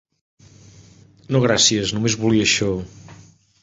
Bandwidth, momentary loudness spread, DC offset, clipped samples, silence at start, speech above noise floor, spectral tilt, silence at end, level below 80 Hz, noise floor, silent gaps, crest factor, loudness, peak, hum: 8 kHz; 11 LU; under 0.1%; under 0.1%; 1.3 s; 30 dB; -3.5 dB/octave; 0.5 s; -48 dBFS; -48 dBFS; none; 18 dB; -18 LUFS; -4 dBFS; none